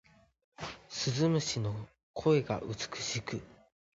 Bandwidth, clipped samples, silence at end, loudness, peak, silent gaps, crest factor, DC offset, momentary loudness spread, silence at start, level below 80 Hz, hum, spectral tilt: 8 kHz; under 0.1%; 0.4 s; -33 LUFS; -16 dBFS; 2.03-2.14 s; 18 dB; under 0.1%; 15 LU; 0.6 s; -62 dBFS; none; -5 dB/octave